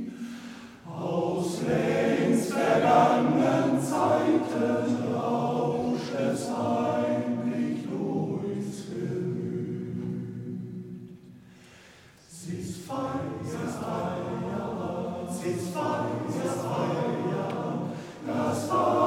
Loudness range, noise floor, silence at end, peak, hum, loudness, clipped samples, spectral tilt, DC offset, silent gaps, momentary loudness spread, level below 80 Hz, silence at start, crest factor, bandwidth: 12 LU; -53 dBFS; 0 s; -8 dBFS; none; -28 LUFS; under 0.1%; -6.5 dB/octave; under 0.1%; none; 13 LU; -64 dBFS; 0 s; 20 dB; 16 kHz